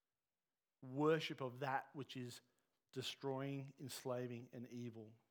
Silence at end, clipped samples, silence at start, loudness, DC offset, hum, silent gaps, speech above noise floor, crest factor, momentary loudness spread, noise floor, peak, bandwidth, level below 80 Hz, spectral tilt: 0.15 s; under 0.1%; 0.8 s; -46 LUFS; under 0.1%; none; none; over 45 dB; 20 dB; 15 LU; under -90 dBFS; -26 dBFS; over 20 kHz; under -90 dBFS; -5.5 dB/octave